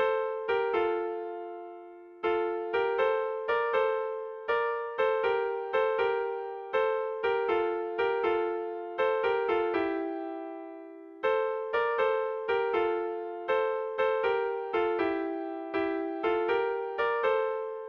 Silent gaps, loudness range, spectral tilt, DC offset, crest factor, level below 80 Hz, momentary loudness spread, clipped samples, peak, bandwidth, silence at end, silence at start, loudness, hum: none; 2 LU; -6 dB/octave; under 0.1%; 14 dB; -68 dBFS; 9 LU; under 0.1%; -16 dBFS; 5.6 kHz; 0 s; 0 s; -30 LUFS; none